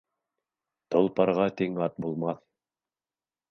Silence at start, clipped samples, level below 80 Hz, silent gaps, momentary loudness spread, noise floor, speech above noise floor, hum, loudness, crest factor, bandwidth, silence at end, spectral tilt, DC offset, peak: 0.9 s; under 0.1%; -68 dBFS; none; 8 LU; under -90 dBFS; over 63 dB; none; -27 LUFS; 22 dB; 6.4 kHz; 1.15 s; -8.5 dB/octave; under 0.1%; -8 dBFS